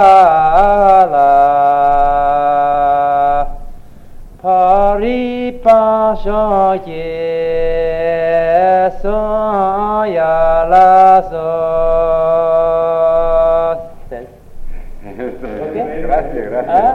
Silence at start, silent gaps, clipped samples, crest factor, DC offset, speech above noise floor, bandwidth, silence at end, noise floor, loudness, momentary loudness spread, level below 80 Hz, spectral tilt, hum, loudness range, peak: 0 s; none; under 0.1%; 12 dB; under 0.1%; 19 dB; 6.8 kHz; 0 s; -32 dBFS; -12 LUFS; 12 LU; -28 dBFS; -7 dB/octave; none; 5 LU; 0 dBFS